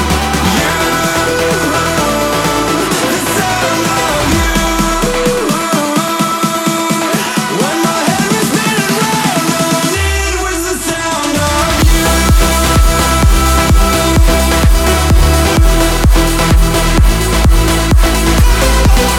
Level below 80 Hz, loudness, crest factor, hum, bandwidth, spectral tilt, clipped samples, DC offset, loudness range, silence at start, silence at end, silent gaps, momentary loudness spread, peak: -14 dBFS; -11 LUFS; 10 dB; none; 17.5 kHz; -4 dB/octave; under 0.1%; under 0.1%; 3 LU; 0 s; 0 s; none; 3 LU; 0 dBFS